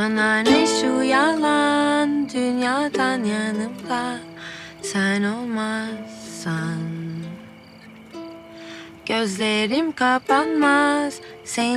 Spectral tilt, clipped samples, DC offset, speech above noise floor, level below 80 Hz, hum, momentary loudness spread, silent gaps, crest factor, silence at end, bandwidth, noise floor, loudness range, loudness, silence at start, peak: -4 dB/octave; under 0.1%; under 0.1%; 23 dB; -62 dBFS; none; 18 LU; none; 18 dB; 0 s; 13.5 kHz; -44 dBFS; 10 LU; -21 LUFS; 0 s; -4 dBFS